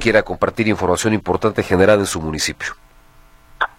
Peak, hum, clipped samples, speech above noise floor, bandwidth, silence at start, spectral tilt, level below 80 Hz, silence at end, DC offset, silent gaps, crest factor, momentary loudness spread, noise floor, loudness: 0 dBFS; none; under 0.1%; 30 dB; 16.5 kHz; 0 s; -4.5 dB/octave; -40 dBFS; 0.1 s; under 0.1%; none; 18 dB; 9 LU; -47 dBFS; -18 LUFS